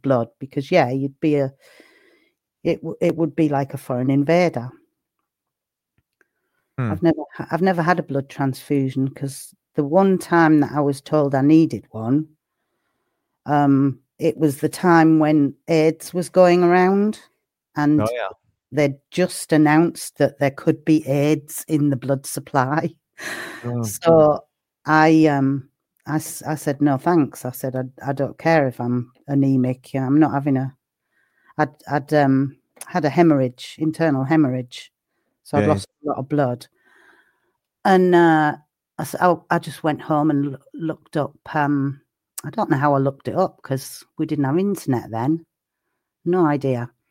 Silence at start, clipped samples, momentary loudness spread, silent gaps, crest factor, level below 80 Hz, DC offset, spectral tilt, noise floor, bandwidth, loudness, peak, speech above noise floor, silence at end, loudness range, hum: 0.05 s; under 0.1%; 13 LU; none; 20 dB; -62 dBFS; under 0.1%; -7 dB/octave; -84 dBFS; 16.5 kHz; -20 LUFS; 0 dBFS; 65 dB; 0.25 s; 5 LU; none